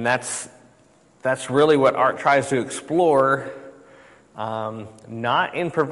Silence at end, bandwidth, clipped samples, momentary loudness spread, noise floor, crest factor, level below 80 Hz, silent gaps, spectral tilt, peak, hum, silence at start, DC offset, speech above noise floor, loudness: 0 s; 11.5 kHz; under 0.1%; 17 LU; -55 dBFS; 16 dB; -64 dBFS; none; -4.5 dB/octave; -6 dBFS; none; 0 s; under 0.1%; 35 dB; -21 LUFS